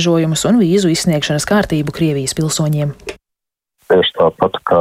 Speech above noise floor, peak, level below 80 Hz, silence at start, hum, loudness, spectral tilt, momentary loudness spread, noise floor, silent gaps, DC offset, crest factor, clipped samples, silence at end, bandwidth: 67 dB; -2 dBFS; -42 dBFS; 0 s; none; -15 LUFS; -5 dB/octave; 6 LU; -81 dBFS; none; under 0.1%; 14 dB; under 0.1%; 0 s; 16 kHz